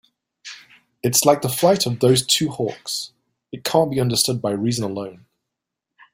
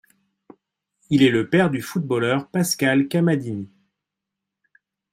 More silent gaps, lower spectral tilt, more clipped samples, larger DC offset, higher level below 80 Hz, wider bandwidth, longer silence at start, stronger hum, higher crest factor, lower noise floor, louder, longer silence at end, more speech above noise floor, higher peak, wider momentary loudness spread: neither; second, -4 dB/octave vs -5.5 dB/octave; neither; neither; about the same, -58 dBFS vs -62 dBFS; about the same, 16.5 kHz vs 16 kHz; second, 0.45 s vs 1.1 s; neither; about the same, 20 dB vs 18 dB; about the same, -83 dBFS vs -84 dBFS; about the same, -19 LUFS vs -20 LUFS; second, 1 s vs 1.45 s; about the same, 63 dB vs 64 dB; about the same, -2 dBFS vs -4 dBFS; first, 20 LU vs 10 LU